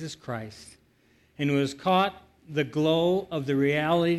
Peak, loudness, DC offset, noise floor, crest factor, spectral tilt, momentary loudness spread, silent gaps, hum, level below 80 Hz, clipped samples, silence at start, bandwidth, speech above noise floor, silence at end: -10 dBFS; -26 LUFS; under 0.1%; -63 dBFS; 16 dB; -6.5 dB/octave; 13 LU; none; none; -62 dBFS; under 0.1%; 0 s; 12 kHz; 37 dB; 0 s